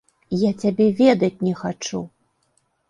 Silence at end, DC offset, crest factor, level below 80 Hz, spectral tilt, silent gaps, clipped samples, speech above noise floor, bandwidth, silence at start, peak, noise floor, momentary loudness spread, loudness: 0.85 s; under 0.1%; 18 dB; -60 dBFS; -6.5 dB/octave; none; under 0.1%; 48 dB; 10.5 kHz; 0.3 s; -4 dBFS; -67 dBFS; 13 LU; -20 LUFS